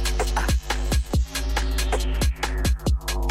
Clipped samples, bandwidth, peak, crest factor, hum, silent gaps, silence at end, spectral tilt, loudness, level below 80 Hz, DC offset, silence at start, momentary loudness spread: under 0.1%; 16 kHz; -10 dBFS; 12 dB; none; none; 0 s; -4.5 dB/octave; -25 LUFS; -24 dBFS; under 0.1%; 0 s; 2 LU